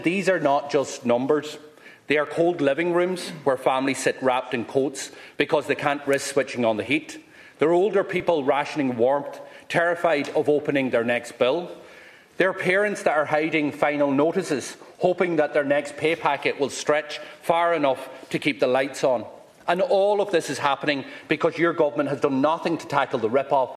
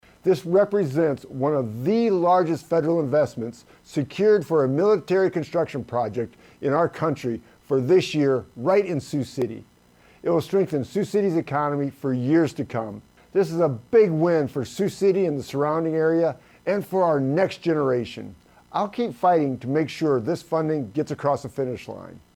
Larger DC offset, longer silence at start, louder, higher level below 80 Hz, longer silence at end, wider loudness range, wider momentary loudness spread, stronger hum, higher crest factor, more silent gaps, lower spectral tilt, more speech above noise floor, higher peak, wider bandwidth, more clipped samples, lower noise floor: neither; second, 0 s vs 0.25 s; about the same, -23 LUFS vs -23 LUFS; second, -70 dBFS vs -62 dBFS; second, 0.05 s vs 0.2 s; about the same, 1 LU vs 3 LU; second, 7 LU vs 10 LU; neither; about the same, 20 dB vs 16 dB; neither; second, -4.5 dB/octave vs -7.5 dB/octave; second, 25 dB vs 33 dB; first, -4 dBFS vs -8 dBFS; second, 14 kHz vs 15.5 kHz; neither; second, -48 dBFS vs -55 dBFS